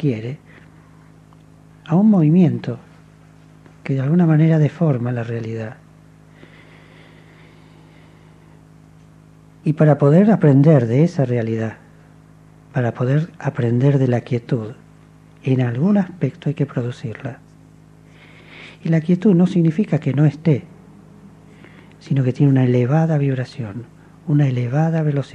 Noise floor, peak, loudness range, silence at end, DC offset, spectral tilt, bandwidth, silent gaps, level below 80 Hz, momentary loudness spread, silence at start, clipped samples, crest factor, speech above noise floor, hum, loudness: -46 dBFS; 0 dBFS; 7 LU; 0.05 s; under 0.1%; -9.5 dB/octave; 7.6 kHz; none; -58 dBFS; 16 LU; 0 s; under 0.1%; 18 dB; 30 dB; none; -18 LUFS